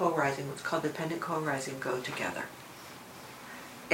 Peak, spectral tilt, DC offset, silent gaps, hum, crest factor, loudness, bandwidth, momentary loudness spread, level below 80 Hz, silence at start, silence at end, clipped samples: -10 dBFS; -4.5 dB/octave; under 0.1%; none; none; 24 dB; -34 LUFS; 16 kHz; 15 LU; -72 dBFS; 0 s; 0 s; under 0.1%